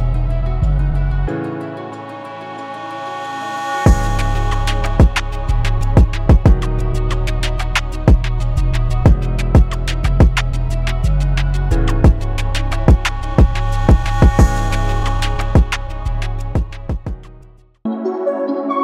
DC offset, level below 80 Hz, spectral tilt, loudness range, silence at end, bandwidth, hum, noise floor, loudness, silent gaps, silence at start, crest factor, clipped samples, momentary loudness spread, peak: under 0.1%; -16 dBFS; -6.5 dB/octave; 6 LU; 0 s; 12 kHz; none; -43 dBFS; -17 LUFS; none; 0 s; 14 dB; under 0.1%; 12 LU; 0 dBFS